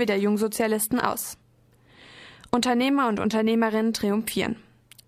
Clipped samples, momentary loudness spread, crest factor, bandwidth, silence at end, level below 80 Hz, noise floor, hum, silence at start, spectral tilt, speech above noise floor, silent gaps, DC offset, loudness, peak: under 0.1%; 9 LU; 20 dB; 15.5 kHz; 0.5 s; -60 dBFS; -59 dBFS; none; 0 s; -4.5 dB/octave; 35 dB; none; under 0.1%; -24 LUFS; -6 dBFS